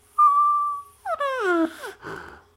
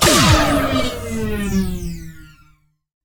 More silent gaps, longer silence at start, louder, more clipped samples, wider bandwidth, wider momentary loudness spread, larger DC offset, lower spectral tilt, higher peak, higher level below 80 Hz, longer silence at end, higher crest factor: neither; first, 0.15 s vs 0 s; second, -22 LUFS vs -17 LUFS; neither; second, 15.5 kHz vs 19.5 kHz; about the same, 20 LU vs 19 LU; neither; about the same, -4.5 dB/octave vs -4 dB/octave; second, -10 dBFS vs -2 dBFS; second, -62 dBFS vs -28 dBFS; second, 0.2 s vs 0.8 s; about the same, 14 dB vs 16 dB